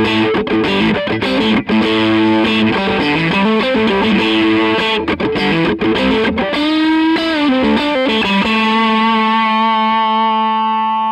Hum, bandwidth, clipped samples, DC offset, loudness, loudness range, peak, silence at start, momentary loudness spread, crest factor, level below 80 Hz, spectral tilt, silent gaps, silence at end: none; 10 kHz; under 0.1%; under 0.1%; -13 LUFS; 1 LU; -4 dBFS; 0 s; 3 LU; 10 dB; -42 dBFS; -6 dB/octave; none; 0 s